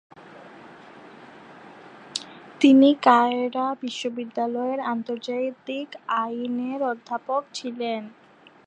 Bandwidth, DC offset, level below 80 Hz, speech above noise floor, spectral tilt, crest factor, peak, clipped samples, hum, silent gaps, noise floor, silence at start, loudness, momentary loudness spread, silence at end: 9.6 kHz; under 0.1%; -80 dBFS; 23 dB; -4 dB/octave; 22 dB; -4 dBFS; under 0.1%; none; none; -46 dBFS; 0.2 s; -24 LUFS; 17 LU; 0.55 s